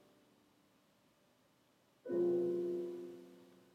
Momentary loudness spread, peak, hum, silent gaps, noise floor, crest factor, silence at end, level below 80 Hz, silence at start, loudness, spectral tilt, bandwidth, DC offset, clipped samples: 20 LU; -26 dBFS; none; none; -73 dBFS; 16 dB; 0.3 s; under -90 dBFS; 2.05 s; -38 LUFS; -8.5 dB/octave; 6.2 kHz; under 0.1%; under 0.1%